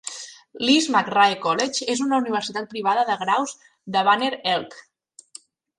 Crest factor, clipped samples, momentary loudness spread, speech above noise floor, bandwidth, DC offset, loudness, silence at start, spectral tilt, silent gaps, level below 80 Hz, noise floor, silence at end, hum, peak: 18 dB; under 0.1%; 14 LU; 27 dB; 11.5 kHz; under 0.1%; -21 LUFS; 0.05 s; -2.5 dB/octave; none; -70 dBFS; -48 dBFS; 1 s; none; -4 dBFS